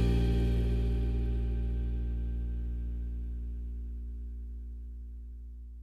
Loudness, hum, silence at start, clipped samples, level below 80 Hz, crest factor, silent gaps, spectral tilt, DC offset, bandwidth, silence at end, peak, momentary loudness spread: -35 LUFS; none; 0 s; under 0.1%; -32 dBFS; 14 dB; none; -8.5 dB/octave; under 0.1%; 5 kHz; 0 s; -18 dBFS; 16 LU